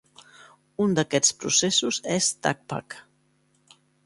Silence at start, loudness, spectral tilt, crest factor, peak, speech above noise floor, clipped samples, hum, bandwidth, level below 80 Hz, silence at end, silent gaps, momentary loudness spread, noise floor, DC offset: 0.8 s; -23 LUFS; -2.5 dB/octave; 22 dB; -6 dBFS; 41 dB; under 0.1%; none; 11.5 kHz; -66 dBFS; 1.05 s; none; 18 LU; -66 dBFS; under 0.1%